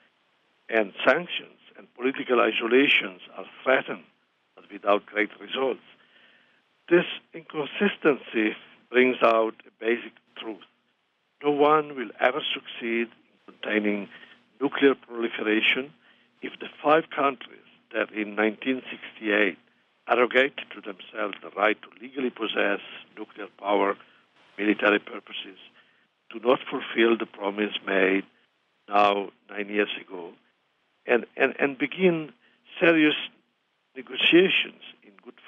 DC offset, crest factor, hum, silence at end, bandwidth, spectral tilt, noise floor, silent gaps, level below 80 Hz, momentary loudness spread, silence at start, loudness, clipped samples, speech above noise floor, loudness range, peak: under 0.1%; 20 dB; none; 0.2 s; 6.4 kHz; -6.5 dB/octave; -72 dBFS; none; -80 dBFS; 18 LU; 0.7 s; -25 LUFS; under 0.1%; 47 dB; 4 LU; -6 dBFS